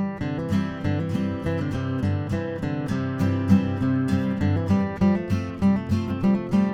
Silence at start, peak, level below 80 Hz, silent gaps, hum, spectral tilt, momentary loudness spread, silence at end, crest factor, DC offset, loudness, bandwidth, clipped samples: 0 s; -6 dBFS; -46 dBFS; none; none; -8.5 dB/octave; 6 LU; 0 s; 18 dB; under 0.1%; -24 LUFS; 9 kHz; under 0.1%